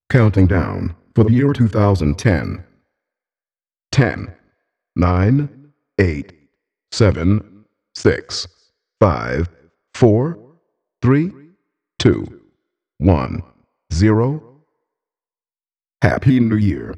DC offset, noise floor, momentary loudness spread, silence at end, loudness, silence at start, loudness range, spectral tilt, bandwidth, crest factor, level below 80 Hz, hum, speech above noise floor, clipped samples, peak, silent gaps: under 0.1%; under -90 dBFS; 14 LU; 0 s; -17 LUFS; 0.1 s; 3 LU; -7.5 dB/octave; 9.2 kHz; 18 dB; -36 dBFS; none; over 75 dB; under 0.1%; 0 dBFS; none